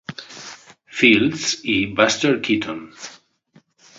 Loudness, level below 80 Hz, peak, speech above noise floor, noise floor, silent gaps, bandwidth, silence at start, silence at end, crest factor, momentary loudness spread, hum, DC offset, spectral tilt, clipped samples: -18 LUFS; -56 dBFS; -2 dBFS; 38 dB; -56 dBFS; none; 7.8 kHz; 0.1 s; 0.85 s; 20 dB; 22 LU; none; under 0.1%; -3.5 dB/octave; under 0.1%